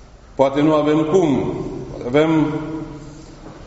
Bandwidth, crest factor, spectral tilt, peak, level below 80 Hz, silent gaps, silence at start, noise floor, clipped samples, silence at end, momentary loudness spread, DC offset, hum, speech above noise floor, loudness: 8 kHz; 18 dB; -6.5 dB/octave; 0 dBFS; -44 dBFS; none; 0 s; -37 dBFS; under 0.1%; 0 s; 21 LU; under 0.1%; none; 21 dB; -18 LUFS